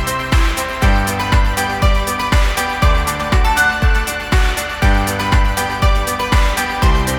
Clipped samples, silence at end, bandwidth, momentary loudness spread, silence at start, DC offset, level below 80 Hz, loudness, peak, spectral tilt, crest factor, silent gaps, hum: under 0.1%; 0 s; 18 kHz; 3 LU; 0 s; under 0.1%; -16 dBFS; -16 LUFS; 0 dBFS; -4.5 dB/octave; 14 dB; none; none